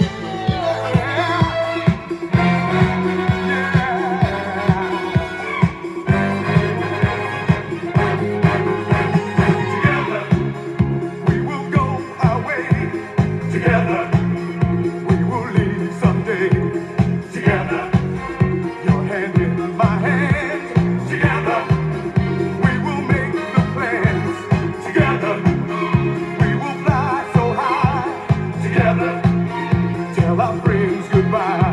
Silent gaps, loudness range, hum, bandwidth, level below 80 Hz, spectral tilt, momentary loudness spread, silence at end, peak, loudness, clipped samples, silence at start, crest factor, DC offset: none; 1 LU; none; 10.5 kHz; -38 dBFS; -8 dB/octave; 4 LU; 0 s; -2 dBFS; -18 LUFS; under 0.1%; 0 s; 16 dB; under 0.1%